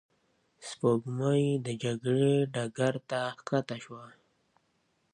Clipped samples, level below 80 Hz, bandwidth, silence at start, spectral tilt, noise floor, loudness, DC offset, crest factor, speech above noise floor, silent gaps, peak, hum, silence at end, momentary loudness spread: under 0.1%; -74 dBFS; 10.5 kHz; 0.6 s; -6.5 dB/octave; -74 dBFS; -30 LUFS; under 0.1%; 18 dB; 44 dB; none; -12 dBFS; none; 1.05 s; 16 LU